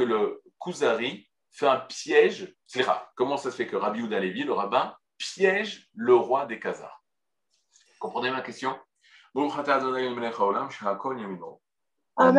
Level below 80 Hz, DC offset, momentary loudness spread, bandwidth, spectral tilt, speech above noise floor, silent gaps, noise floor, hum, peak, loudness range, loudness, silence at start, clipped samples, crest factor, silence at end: -82 dBFS; under 0.1%; 15 LU; 11 kHz; -4.5 dB/octave; 59 dB; none; -86 dBFS; none; -6 dBFS; 4 LU; -27 LUFS; 0 s; under 0.1%; 22 dB; 0 s